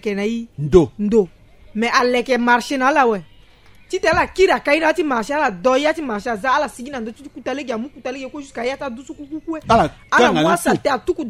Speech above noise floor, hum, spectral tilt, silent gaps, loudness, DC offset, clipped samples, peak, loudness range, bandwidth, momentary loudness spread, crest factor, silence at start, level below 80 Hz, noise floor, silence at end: 28 dB; none; -5 dB/octave; none; -18 LUFS; under 0.1%; under 0.1%; 0 dBFS; 7 LU; 15.5 kHz; 14 LU; 18 dB; 0.05 s; -42 dBFS; -46 dBFS; 0 s